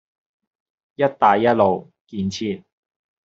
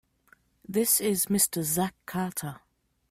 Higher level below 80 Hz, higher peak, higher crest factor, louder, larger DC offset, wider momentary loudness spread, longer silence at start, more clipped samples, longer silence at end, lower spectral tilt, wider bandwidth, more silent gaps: about the same, -64 dBFS vs -64 dBFS; first, -2 dBFS vs -10 dBFS; about the same, 20 dB vs 20 dB; first, -20 LUFS vs -26 LUFS; neither; first, 13 LU vs 10 LU; first, 1 s vs 0.7 s; neither; first, 0.7 s vs 0.55 s; about the same, -4.5 dB/octave vs -3.5 dB/octave; second, 7.8 kHz vs 16 kHz; first, 2.01-2.05 s vs none